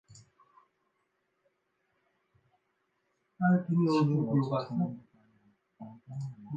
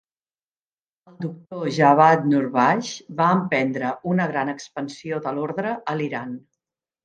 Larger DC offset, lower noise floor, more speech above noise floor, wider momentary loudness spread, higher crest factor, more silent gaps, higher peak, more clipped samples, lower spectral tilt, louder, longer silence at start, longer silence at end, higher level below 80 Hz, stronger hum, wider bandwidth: neither; second, -78 dBFS vs under -90 dBFS; second, 49 dB vs over 69 dB; first, 23 LU vs 16 LU; about the same, 18 dB vs 22 dB; neither; second, -16 dBFS vs -2 dBFS; neither; first, -8.5 dB/octave vs -6.5 dB/octave; second, -30 LUFS vs -21 LUFS; second, 0.1 s vs 1.2 s; second, 0 s vs 0.65 s; second, -78 dBFS vs -70 dBFS; neither; second, 8 kHz vs 9.2 kHz